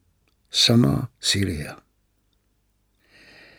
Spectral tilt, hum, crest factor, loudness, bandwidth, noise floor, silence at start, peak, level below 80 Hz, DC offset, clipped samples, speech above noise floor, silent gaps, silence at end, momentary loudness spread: -4 dB/octave; 50 Hz at -50 dBFS; 20 dB; -20 LUFS; 17 kHz; -68 dBFS; 0.55 s; -4 dBFS; -48 dBFS; under 0.1%; under 0.1%; 47 dB; none; 1.85 s; 14 LU